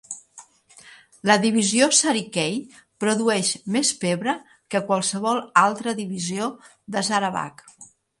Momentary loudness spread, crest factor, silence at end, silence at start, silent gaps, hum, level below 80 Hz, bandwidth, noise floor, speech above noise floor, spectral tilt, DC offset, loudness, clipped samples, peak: 12 LU; 22 dB; 0.35 s; 0.1 s; none; none; -70 dBFS; 11.5 kHz; -50 dBFS; 28 dB; -3 dB/octave; under 0.1%; -22 LUFS; under 0.1%; -2 dBFS